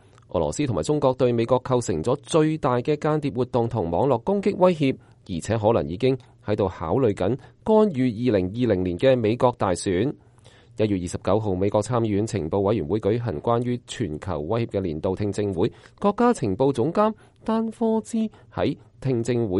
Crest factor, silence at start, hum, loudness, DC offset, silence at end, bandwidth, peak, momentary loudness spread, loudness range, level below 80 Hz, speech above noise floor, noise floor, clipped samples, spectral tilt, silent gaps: 18 dB; 0.35 s; none; -23 LUFS; under 0.1%; 0 s; 11.5 kHz; -4 dBFS; 8 LU; 3 LU; -50 dBFS; 29 dB; -51 dBFS; under 0.1%; -7 dB/octave; none